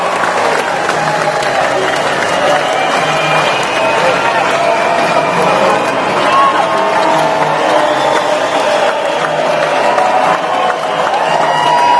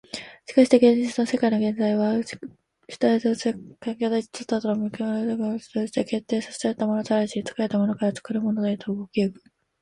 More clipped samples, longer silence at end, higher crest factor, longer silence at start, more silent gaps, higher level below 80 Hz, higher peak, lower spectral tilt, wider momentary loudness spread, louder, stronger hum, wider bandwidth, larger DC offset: neither; second, 0 s vs 0.5 s; second, 12 dB vs 20 dB; second, 0 s vs 0.15 s; neither; first, -52 dBFS vs -66 dBFS; first, 0 dBFS vs -4 dBFS; second, -3.5 dB/octave vs -6 dB/octave; second, 3 LU vs 9 LU; first, -11 LUFS vs -24 LUFS; neither; about the same, 11 kHz vs 11 kHz; neither